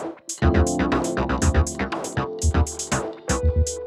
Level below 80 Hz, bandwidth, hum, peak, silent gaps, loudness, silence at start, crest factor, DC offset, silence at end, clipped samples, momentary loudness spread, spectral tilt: -28 dBFS; 13 kHz; none; -6 dBFS; none; -23 LUFS; 0 s; 16 dB; under 0.1%; 0 s; under 0.1%; 6 LU; -5.5 dB/octave